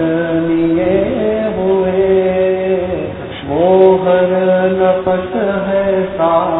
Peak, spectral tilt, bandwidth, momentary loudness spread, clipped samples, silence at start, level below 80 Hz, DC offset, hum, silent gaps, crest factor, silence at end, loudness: 0 dBFS; -11.5 dB/octave; 4 kHz; 7 LU; under 0.1%; 0 s; -40 dBFS; 0.2%; none; none; 12 dB; 0 s; -13 LUFS